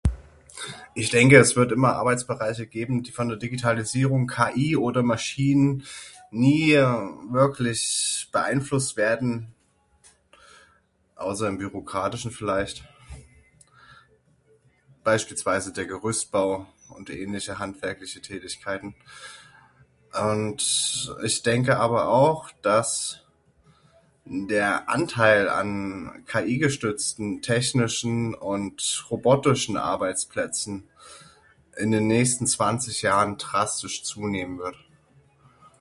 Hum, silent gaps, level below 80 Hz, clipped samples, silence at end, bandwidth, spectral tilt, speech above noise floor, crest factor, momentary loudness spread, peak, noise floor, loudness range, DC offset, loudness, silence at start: none; none; -48 dBFS; under 0.1%; 1.05 s; 11.5 kHz; -4.5 dB/octave; 41 dB; 24 dB; 14 LU; 0 dBFS; -65 dBFS; 9 LU; under 0.1%; -24 LUFS; 0.05 s